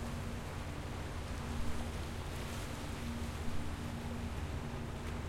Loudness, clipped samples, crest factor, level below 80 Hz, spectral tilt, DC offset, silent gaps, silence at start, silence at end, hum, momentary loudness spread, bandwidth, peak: -42 LUFS; under 0.1%; 14 dB; -46 dBFS; -5.5 dB/octave; under 0.1%; none; 0 s; 0 s; none; 2 LU; 16.5 kHz; -26 dBFS